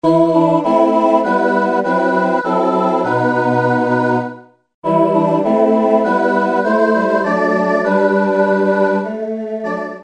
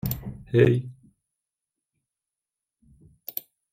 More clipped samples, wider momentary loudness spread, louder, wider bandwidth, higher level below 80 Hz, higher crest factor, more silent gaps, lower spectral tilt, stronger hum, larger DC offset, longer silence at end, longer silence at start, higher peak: neither; second, 7 LU vs 20 LU; first, -15 LUFS vs -25 LUFS; second, 9.6 kHz vs 16.5 kHz; second, -60 dBFS vs -52 dBFS; second, 14 dB vs 22 dB; first, 4.74-4.82 s vs none; about the same, -7.5 dB/octave vs -7.5 dB/octave; neither; neither; second, 0 s vs 0.3 s; about the same, 0.05 s vs 0.05 s; first, 0 dBFS vs -6 dBFS